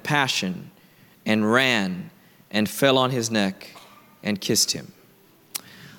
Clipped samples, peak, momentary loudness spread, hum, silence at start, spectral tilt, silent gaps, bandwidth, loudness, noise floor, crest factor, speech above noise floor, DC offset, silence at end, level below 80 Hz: under 0.1%; -4 dBFS; 16 LU; none; 0.05 s; -3.5 dB/octave; none; 18 kHz; -22 LUFS; -55 dBFS; 20 dB; 32 dB; under 0.1%; 0.05 s; -68 dBFS